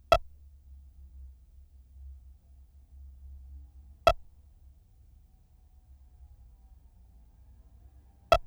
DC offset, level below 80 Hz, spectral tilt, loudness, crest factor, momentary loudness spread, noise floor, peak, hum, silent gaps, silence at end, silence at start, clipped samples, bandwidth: under 0.1%; -46 dBFS; -4 dB/octave; -28 LUFS; 28 dB; 30 LU; -59 dBFS; -8 dBFS; none; none; 0.05 s; 0.1 s; under 0.1%; over 20 kHz